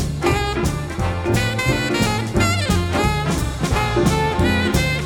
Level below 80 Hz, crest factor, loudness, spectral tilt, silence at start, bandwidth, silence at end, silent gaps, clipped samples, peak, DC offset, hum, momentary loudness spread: -28 dBFS; 16 dB; -19 LUFS; -5 dB/octave; 0 s; 19.5 kHz; 0 s; none; under 0.1%; -4 dBFS; under 0.1%; none; 4 LU